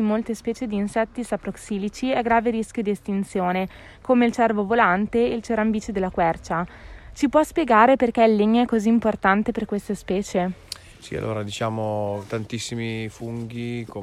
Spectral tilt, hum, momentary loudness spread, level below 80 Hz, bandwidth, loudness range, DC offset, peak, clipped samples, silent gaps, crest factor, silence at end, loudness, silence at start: -6 dB/octave; none; 12 LU; -48 dBFS; 13.5 kHz; 8 LU; under 0.1%; -4 dBFS; under 0.1%; none; 18 dB; 0 s; -23 LUFS; 0 s